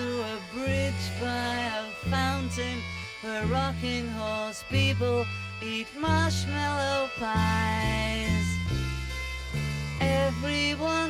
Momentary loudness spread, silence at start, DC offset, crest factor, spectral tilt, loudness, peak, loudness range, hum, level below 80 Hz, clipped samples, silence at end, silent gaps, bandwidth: 7 LU; 0 s; under 0.1%; 16 dB; -5 dB/octave; -29 LUFS; -12 dBFS; 3 LU; none; -40 dBFS; under 0.1%; 0 s; none; 15.5 kHz